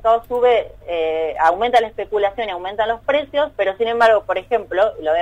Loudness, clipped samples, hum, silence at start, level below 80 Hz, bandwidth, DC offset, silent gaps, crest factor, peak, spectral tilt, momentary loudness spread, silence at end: -18 LUFS; under 0.1%; none; 0 s; -48 dBFS; 10.5 kHz; under 0.1%; none; 14 dB; -4 dBFS; -4.5 dB/octave; 7 LU; 0 s